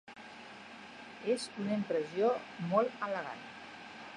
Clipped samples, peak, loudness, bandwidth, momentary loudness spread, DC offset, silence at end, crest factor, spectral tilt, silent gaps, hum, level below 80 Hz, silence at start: under 0.1%; -14 dBFS; -35 LUFS; 10.5 kHz; 17 LU; under 0.1%; 0 s; 22 dB; -5.5 dB/octave; none; none; -78 dBFS; 0.05 s